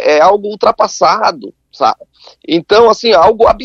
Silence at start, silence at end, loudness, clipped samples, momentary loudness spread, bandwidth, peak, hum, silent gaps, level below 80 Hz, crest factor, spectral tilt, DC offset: 0 s; 0 s; -10 LUFS; 0.3%; 9 LU; 7.6 kHz; 0 dBFS; none; none; -40 dBFS; 10 dB; -3.5 dB/octave; under 0.1%